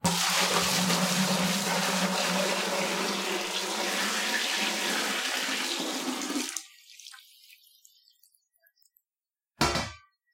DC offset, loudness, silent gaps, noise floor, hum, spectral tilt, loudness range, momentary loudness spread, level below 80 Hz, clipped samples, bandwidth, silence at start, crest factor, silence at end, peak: under 0.1%; -27 LUFS; none; under -90 dBFS; none; -2.5 dB/octave; 11 LU; 9 LU; -56 dBFS; under 0.1%; 16.5 kHz; 0.05 s; 22 dB; 0.35 s; -8 dBFS